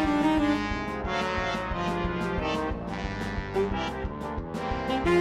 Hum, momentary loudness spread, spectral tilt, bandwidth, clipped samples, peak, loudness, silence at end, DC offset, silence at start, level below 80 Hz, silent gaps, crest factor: none; 9 LU; -6 dB/octave; 13 kHz; under 0.1%; -12 dBFS; -29 LUFS; 0 s; under 0.1%; 0 s; -40 dBFS; none; 16 dB